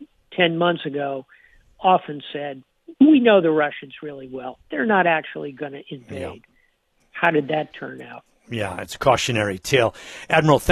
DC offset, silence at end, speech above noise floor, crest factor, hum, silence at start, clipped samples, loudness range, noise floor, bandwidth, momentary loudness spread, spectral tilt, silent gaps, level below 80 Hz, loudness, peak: under 0.1%; 0 s; 44 dB; 18 dB; none; 0 s; under 0.1%; 7 LU; -64 dBFS; 14 kHz; 19 LU; -5.5 dB/octave; none; -52 dBFS; -20 LUFS; -2 dBFS